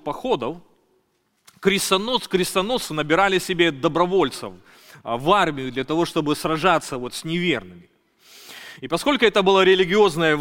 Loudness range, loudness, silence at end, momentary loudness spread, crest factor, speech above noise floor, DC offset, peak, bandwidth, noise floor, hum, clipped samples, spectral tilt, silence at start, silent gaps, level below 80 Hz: 4 LU; -20 LUFS; 0 s; 14 LU; 18 dB; 47 dB; under 0.1%; -2 dBFS; 17 kHz; -67 dBFS; none; under 0.1%; -4 dB/octave; 0.05 s; none; -50 dBFS